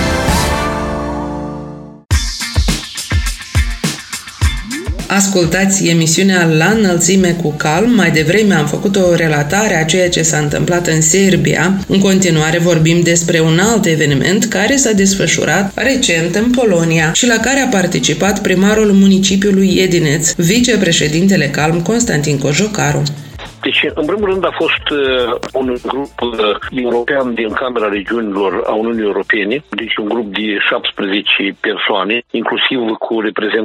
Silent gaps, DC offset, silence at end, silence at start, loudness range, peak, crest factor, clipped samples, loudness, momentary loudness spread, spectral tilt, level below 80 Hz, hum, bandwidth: none; under 0.1%; 0 s; 0 s; 5 LU; 0 dBFS; 12 dB; under 0.1%; -13 LUFS; 8 LU; -4 dB/octave; -28 dBFS; none; 16.5 kHz